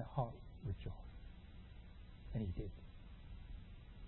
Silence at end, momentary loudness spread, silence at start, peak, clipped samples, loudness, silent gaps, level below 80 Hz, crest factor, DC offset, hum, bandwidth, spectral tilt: 0 s; 15 LU; 0 s; -26 dBFS; under 0.1%; -50 LUFS; none; -54 dBFS; 22 dB; under 0.1%; none; 4 kHz; -8 dB/octave